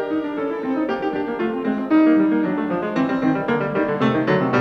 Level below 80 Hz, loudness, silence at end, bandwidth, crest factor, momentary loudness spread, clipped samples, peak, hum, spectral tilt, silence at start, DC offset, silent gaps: -56 dBFS; -20 LUFS; 0 s; 6.2 kHz; 14 dB; 8 LU; under 0.1%; -6 dBFS; none; -8 dB/octave; 0 s; under 0.1%; none